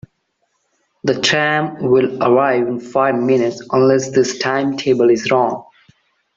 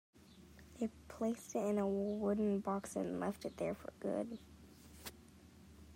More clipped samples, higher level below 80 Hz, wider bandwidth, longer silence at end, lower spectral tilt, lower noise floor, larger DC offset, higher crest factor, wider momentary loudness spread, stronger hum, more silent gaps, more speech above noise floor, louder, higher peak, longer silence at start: neither; first, -58 dBFS vs -68 dBFS; second, 7.8 kHz vs 16 kHz; first, 0.75 s vs 0 s; second, -5 dB/octave vs -6.5 dB/octave; first, -67 dBFS vs -61 dBFS; neither; about the same, 16 dB vs 16 dB; second, 5 LU vs 24 LU; neither; neither; first, 52 dB vs 22 dB; first, -16 LUFS vs -40 LUFS; first, -2 dBFS vs -26 dBFS; first, 1.05 s vs 0.15 s